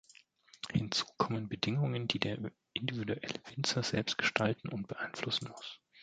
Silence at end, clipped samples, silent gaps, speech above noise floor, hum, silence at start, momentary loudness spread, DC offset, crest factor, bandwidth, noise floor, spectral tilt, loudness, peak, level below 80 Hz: 0 s; under 0.1%; none; 27 dB; none; 0.65 s; 10 LU; under 0.1%; 28 dB; 9.4 kHz; -63 dBFS; -4.5 dB/octave; -35 LUFS; -8 dBFS; -64 dBFS